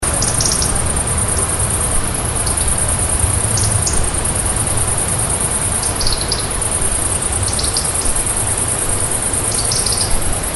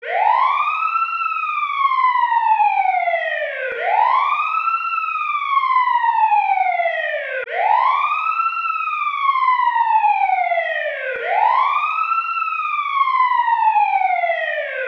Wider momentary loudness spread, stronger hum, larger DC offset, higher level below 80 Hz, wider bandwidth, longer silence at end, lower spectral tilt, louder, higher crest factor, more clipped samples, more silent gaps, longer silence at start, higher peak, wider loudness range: second, 2 LU vs 5 LU; second, none vs 60 Hz at -85 dBFS; neither; first, -24 dBFS vs -78 dBFS; first, 12 kHz vs 6.4 kHz; about the same, 0 s vs 0 s; first, -2.5 dB/octave vs 0 dB/octave; first, -15 LUFS vs -18 LUFS; about the same, 16 dB vs 14 dB; neither; neither; about the same, 0 s vs 0 s; first, 0 dBFS vs -4 dBFS; about the same, 1 LU vs 1 LU